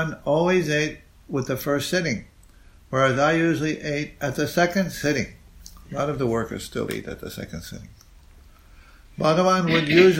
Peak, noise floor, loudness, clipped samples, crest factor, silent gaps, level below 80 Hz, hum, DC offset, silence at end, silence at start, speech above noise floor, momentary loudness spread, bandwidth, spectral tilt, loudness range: -2 dBFS; -50 dBFS; -23 LUFS; under 0.1%; 20 dB; none; -48 dBFS; none; under 0.1%; 0 s; 0 s; 28 dB; 16 LU; 16.5 kHz; -5.5 dB/octave; 7 LU